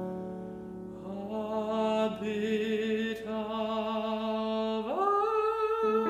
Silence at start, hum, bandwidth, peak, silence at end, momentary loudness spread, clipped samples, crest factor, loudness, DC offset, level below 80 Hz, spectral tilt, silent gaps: 0 s; none; 13.5 kHz; -18 dBFS; 0 s; 12 LU; under 0.1%; 14 dB; -31 LUFS; under 0.1%; -64 dBFS; -6 dB/octave; none